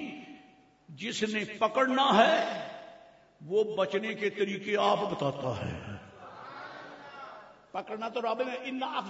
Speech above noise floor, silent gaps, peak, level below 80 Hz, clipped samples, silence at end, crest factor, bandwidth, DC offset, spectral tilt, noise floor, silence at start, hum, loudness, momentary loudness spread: 30 dB; none; -10 dBFS; -68 dBFS; under 0.1%; 0 s; 22 dB; 8 kHz; under 0.1%; -4.5 dB/octave; -59 dBFS; 0 s; none; -30 LUFS; 21 LU